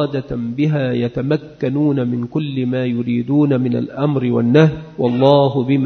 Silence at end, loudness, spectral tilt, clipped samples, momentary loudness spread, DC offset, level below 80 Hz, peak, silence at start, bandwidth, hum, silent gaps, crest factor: 0 s; -17 LUFS; -9 dB/octave; under 0.1%; 8 LU; under 0.1%; -48 dBFS; 0 dBFS; 0 s; 6.4 kHz; none; none; 16 dB